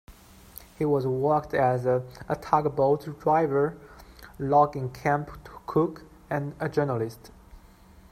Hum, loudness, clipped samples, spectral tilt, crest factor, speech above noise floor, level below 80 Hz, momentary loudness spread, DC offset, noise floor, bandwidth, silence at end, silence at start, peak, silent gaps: none; -26 LUFS; under 0.1%; -8 dB/octave; 22 dB; 27 dB; -54 dBFS; 15 LU; under 0.1%; -52 dBFS; 16 kHz; 0.55 s; 0.1 s; -6 dBFS; none